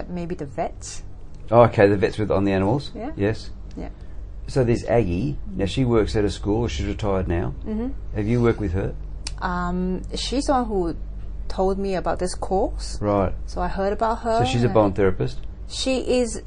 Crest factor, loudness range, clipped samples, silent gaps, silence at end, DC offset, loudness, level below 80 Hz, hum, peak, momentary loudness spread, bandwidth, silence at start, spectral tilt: 20 dB; 4 LU; under 0.1%; none; 0 s; under 0.1%; -23 LUFS; -32 dBFS; none; -2 dBFS; 16 LU; 10 kHz; 0 s; -6.5 dB/octave